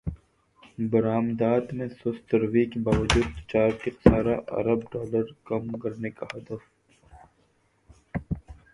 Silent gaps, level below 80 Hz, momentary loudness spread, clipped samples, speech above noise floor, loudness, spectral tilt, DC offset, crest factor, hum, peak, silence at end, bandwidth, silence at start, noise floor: none; -42 dBFS; 15 LU; under 0.1%; 41 dB; -26 LUFS; -6.5 dB/octave; under 0.1%; 26 dB; none; 0 dBFS; 0.2 s; 11.5 kHz; 0.05 s; -66 dBFS